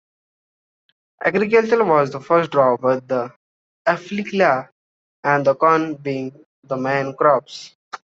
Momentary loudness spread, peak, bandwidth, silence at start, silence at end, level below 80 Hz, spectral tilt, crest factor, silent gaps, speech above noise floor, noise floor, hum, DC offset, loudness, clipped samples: 13 LU; -2 dBFS; 7.8 kHz; 1.2 s; 0.2 s; -66 dBFS; -6.5 dB/octave; 18 dB; 3.36-3.85 s, 4.72-5.23 s, 6.46-6.63 s, 7.75-7.91 s; over 72 dB; under -90 dBFS; none; under 0.1%; -19 LUFS; under 0.1%